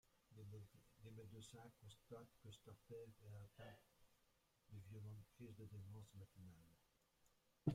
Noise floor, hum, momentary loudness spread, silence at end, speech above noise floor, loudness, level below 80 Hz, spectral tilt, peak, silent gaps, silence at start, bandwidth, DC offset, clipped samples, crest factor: -82 dBFS; none; 6 LU; 0 s; 22 dB; -61 LUFS; -80 dBFS; -7 dB/octave; -28 dBFS; none; 0.05 s; 16 kHz; under 0.1%; under 0.1%; 30 dB